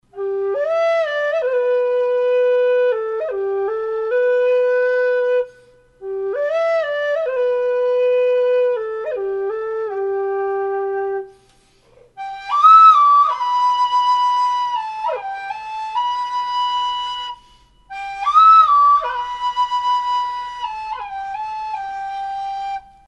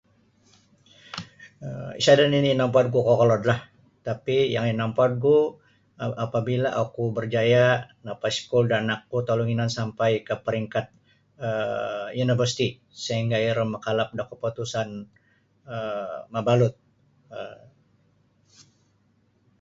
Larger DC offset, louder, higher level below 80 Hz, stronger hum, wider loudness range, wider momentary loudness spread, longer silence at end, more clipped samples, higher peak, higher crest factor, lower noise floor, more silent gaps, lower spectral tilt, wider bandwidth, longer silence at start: neither; first, -17 LUFS vs -24 LUFS; about the same, -58 dBFS vs -60 dBFS; neither; first, 10 LU vs 7 LU; second, 15 LU vs 18 LU; second, 0.3 s vs 2.05 s; neither; about the same, -2 dBFS vs -4 dBFS; second, 16 dB vs 22 dB; second, -54 dBFS vs -65 dBFS; neither; second, -2.5 dB/octave vs -6 dB/octave; about the same, 8.4 kHz vs 7.8 kHz; second, 0.15 s vs 1.15 s